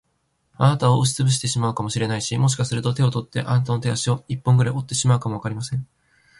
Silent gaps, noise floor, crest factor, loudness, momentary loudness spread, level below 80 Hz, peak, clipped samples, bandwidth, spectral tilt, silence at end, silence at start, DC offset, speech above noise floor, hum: none; -69 dBFS; 16 dB; -21 LUFS; 8 LU; -52 dBFS; -6 dBFS; under 0.1%; 11.5 kHz; -5 dB/octave; 0.55 s; 0.6 s; under 0.1%; 49 dB; none